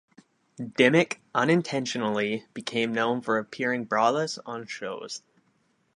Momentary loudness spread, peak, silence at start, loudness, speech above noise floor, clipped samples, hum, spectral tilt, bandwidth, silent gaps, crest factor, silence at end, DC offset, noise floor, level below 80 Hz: 14 LU; -4 dBFS; 0.6 s; -26 LUFS; 43 dB; under 0.1%; none; -5 dB/octave; 11 kHz; none; 24 dB; 0.8 s; under 0.1%; -69 dBFS; -74 dBFS